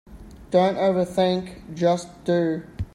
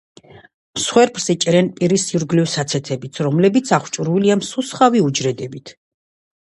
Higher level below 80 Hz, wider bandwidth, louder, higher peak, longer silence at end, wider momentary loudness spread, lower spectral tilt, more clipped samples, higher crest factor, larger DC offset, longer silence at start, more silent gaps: first, -48 dBFS vs -60 dBFS; about the same, 12 kHz vs 11.5 kHz; second, -23 LUFS vs -17 LUFS; second, -6 dBFS vs 0 dBFS; second, 0.1 s vs 0.75 s; about the same, 7 LU vs 9 LU; first, -6.5 dB/octave vs -5 dB/octave; neither; about the same, 18 dB vs 18 dB; neither; second, 0.1 s vs 0.35 s; second, none vs 0.54-0.73 s